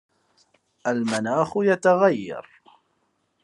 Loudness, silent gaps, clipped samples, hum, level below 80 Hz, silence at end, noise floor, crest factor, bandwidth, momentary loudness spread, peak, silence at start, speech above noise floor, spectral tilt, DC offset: -22 LUFS; none; under 0.1%; none; -74 dBFS; 1 s; -71 dBFS; 20 dB; 11.5 kHz; 13 LU; -4 dBFS; 0.85 s; 49 dB; -5.5 dB/octave; under 0.1%